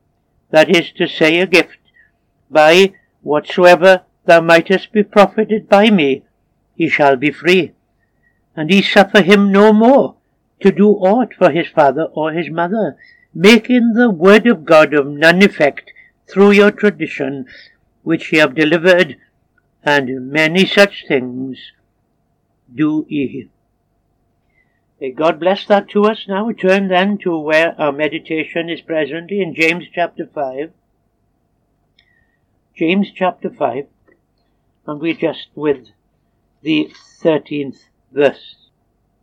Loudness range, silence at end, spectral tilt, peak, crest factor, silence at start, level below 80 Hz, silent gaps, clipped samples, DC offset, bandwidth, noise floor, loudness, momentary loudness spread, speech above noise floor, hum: 11 LU; 0.9 s; -5.5 dB/octave; 0 dBFS; 14 dB; 0.55 s; -60 dBFS; none; 0.2%; under 0.1%; 17.5 kHz; -63 dBFS; -13 LUFS; 14 LU; 50 dB; none